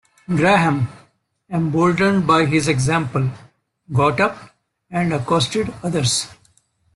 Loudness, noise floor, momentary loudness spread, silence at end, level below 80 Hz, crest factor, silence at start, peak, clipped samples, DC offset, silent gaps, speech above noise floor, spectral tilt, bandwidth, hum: -18 LUFS; -59 dBFS; 10 LU; 0.65 s; -50 dBFS; 18 dB; 0.3 s; -2 dBFS; under 0.1%; under 0.1%; none; 42 dB; -5 dB/octave; 12.5 kHz; none